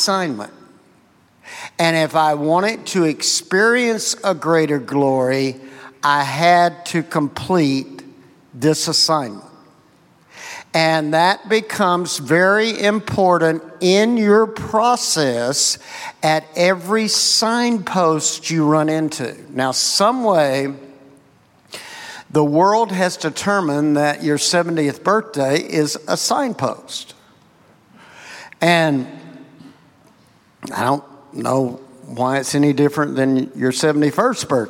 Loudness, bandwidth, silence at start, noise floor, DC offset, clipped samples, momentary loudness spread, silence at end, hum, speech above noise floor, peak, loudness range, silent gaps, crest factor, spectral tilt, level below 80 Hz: -17 LUFS; 16.5 kHz; 0 s; -54 dBFS; under 0.1%; under 0.1%; 15 LU; 0 s; none; 37 dB; -2 dBFS; 6 LU; none; 16 dB; -4 dB/octave; -60 dBFS